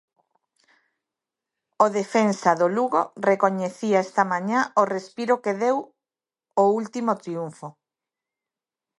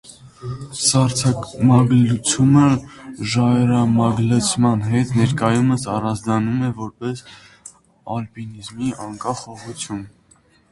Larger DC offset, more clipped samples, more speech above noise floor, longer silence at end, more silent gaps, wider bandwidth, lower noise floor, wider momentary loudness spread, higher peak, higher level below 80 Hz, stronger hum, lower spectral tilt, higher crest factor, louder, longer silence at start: neither; neither; first, over 68 dB vs 37 dB; first, 1.3 s vs 0.65 s; neither; about the same, 11.5 kHz vs 11.5 kHz; first, under -90 dBFS vs -55 dBFS; second, 8 LU vs 17 LU; about the same, -4 dBFS vs -2 dBFS; second, -78 dBFS vs -48 dBFS; neither; about the same, -5.5 dB/octave vs -5.5 dB/octave; about the same, 22 dB vs 18 dB; second, -23 LUFS vs -18 LUFS; first, 1.8 s vs 0.1 s